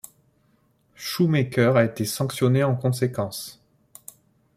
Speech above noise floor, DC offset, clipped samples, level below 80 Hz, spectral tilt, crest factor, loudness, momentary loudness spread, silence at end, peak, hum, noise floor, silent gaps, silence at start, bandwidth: 42 dB; under 0.1%; under 0.1%; -62 dBFS; -6 dB/octave; 18 dB; -23 LUFS; 19 LU; 1.05 s; -6 dBFS; none; -64 dBFS; none; 1 s; 15.5 kHz